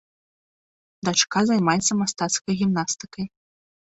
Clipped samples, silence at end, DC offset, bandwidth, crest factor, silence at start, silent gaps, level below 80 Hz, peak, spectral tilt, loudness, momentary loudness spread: under 0.1%; 0.7 s; under 0.1%; 8.2 kHz; 20 dB; 1.05 s; none; -60 dBFS; -4 dBFS; -3.5 dB/octave; -22 LUFS; 12 LU